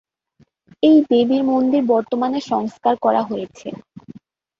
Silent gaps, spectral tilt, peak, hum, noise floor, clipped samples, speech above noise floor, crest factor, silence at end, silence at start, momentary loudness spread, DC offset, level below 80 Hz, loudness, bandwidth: none; -6.5 dB/octave; -4 dBFS; none; -58 dBFS; under 0.1%; 41 dB; 16 dB; 0.5 s; 0.8 s; 16 LU; under 0.1%; -64 dBFS; -17 LUFS; 7.4 kHz